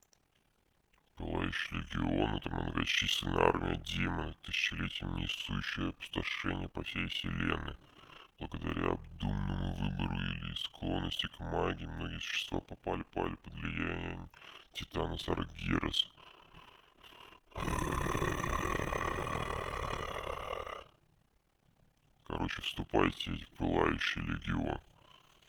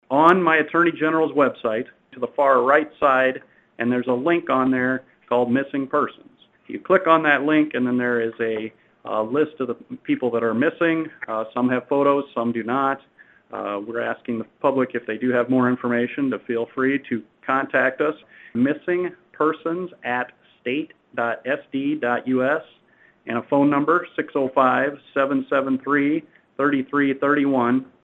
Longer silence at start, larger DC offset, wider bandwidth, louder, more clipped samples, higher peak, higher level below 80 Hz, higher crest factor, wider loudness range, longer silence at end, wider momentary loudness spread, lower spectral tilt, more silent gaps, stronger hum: first, 1.15 s vs 0.1 s; neither; first, over 20 kHz vs 4.1 kHz; second, -36 LUFS vs -21 LUFS; neither; second, -10 dBFS vs 0 dBFS; first, -48 dBFS vs -68 dBFS; first, 28 dB vs 20 dB; about the same, 6 LU vs 5 LU; first, 0.65 s vs 0.2 s; about the same, 12 LU vs 11 LU; second, -5 dB/octave vs -8 dB/octave; neither; neither